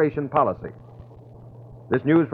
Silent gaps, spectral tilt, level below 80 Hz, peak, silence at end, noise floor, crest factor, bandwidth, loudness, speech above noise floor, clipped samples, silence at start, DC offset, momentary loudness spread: none; -11 dB/octave; -54 dBFS; -4 dBFS; 0 s; -44 dBFS; 20 dB; 4.3 kHz; -23 LUFS; 23 dB; under 0.1%; 0 s; under 0.1%; 25 LU